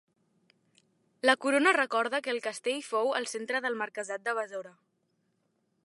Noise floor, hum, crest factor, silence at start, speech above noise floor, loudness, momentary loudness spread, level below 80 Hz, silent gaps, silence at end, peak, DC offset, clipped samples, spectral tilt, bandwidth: -76 dBFS; none; 26 dB; 1.25 s; 46 dB; -29 LUFS; 10 LU; under -90 dBFS; none; 1.15 s; -6 dBFS; under 0.1%; under 0.1%; -1.5 dB/octave; 11.5 kHz